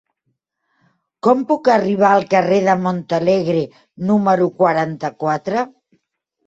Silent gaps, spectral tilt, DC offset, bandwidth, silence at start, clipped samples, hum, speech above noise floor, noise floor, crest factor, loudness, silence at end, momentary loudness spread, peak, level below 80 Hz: none; -7 dB/octave; under 0.1%; 7.8 kHz; 1.25 s; under 0.1%; none; 56 dB; -72 dBFS; 16 dB; -17 LUFS; 0.8 s; 9 LU; -2 dBFS; -60 dBFS